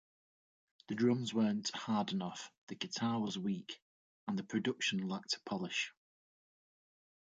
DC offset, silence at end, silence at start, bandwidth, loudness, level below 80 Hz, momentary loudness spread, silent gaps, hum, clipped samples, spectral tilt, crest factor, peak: under 0.1%; 1.3 s; 0.9 s; 9.2 kHz; -37 LUFS; -82 dBFS; 11 LU; 2.58-2.67 s, 3.82-4.27 s; none; under 0.1%; -4.5 dB/octave; 18 dB; -20 dBFS